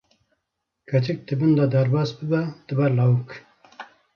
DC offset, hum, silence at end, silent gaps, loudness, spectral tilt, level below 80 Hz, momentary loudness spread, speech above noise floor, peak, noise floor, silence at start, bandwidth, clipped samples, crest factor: under 0.1%; none; 0.3 s; none; -22 LUFS; -9 dB/octave; -64 dBFS; 23 LU; 58 dB; -8 dBFS; -79 dBFS; 0.9 s; 6.6 kHz; under 0.1%; 14 dB